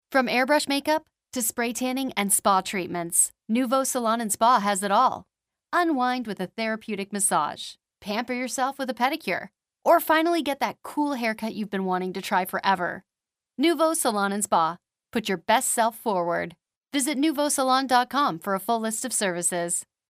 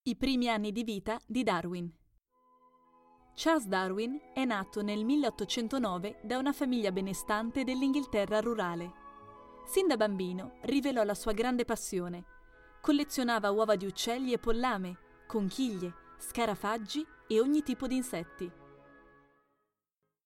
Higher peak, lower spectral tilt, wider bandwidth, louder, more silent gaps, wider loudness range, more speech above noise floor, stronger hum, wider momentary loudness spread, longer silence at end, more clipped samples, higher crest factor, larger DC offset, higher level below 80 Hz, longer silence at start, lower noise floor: first, -6 dBFS vs -14 dBFS; second, -3 dB/octave vs -4.5 dB/octave; about the same, 16 kHz vs 16.5 kHz; first, -24 LUFS vs -33 LUFS; first, 16.77-16.81 s vs none; about the same, 4 LU vs 3 LU; first, 65 dB vs 54 dB; neither; second, 9 LU vs 12 LU; second, 0.25 s vs 1.5 s; neither; about the same, 18 dB vs 18 dB; neither; second, -70 dBFS vs -54 dBFS; about the same, 0.1 s vs 0.05 s; about the same, -89 dBFS vs -86 dBFS